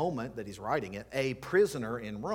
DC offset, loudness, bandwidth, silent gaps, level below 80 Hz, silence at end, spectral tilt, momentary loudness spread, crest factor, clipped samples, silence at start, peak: under 0.1%; -33 LUFS; 17 kHz; none; -60 dBFS; 0 s; -5.5 dB/octave; 10 LU; 16 dB; under 0.1%; 0 s; -16 dBFS